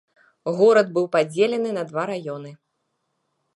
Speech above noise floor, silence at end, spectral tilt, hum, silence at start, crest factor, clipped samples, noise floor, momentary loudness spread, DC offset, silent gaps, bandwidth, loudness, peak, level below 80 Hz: 54 dB; 1 s; -6 dB/octave; none; 0.45 s; 18 dB; under 0.1%; -74 dBFS; 16 LU; under 0.1%; none; 11.5 kHz; -21 LUFS; -6 dBFS; -78 dBFS